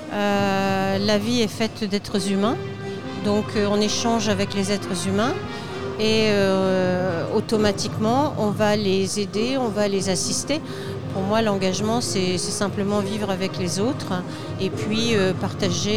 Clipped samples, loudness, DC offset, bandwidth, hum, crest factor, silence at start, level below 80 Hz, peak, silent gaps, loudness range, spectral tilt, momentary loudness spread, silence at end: under 0.1%; -22 LUFS; 0.8%; 15.5 kHz; none; 16 dB; 0 s; -52 dBFS; -6 dBFS; none; 2 LU; -4.5 dB/octave; 7 LU; 0 s